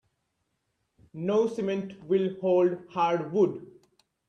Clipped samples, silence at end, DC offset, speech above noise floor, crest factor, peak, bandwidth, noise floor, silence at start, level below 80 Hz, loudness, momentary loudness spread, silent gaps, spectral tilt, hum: under 0.1%; 0.6 s; under 0.1%; 52 dB; 16 dB; -12 dBFS; 8.2 kHz; -78 dBFS; 1.15 s; -72 dBFS; -27 LUFS; 10 LU; none; -7.5 dB/octave; none